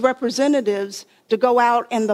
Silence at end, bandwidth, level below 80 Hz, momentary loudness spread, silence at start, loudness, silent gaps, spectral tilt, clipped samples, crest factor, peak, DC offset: 0 s; 15 kHz; -68 dBFS; 11 LU; 0 s; -19 LUFS; none; -4 dB/octave; under 0.1%; 16 dB; -4 dBFS; under 0.1%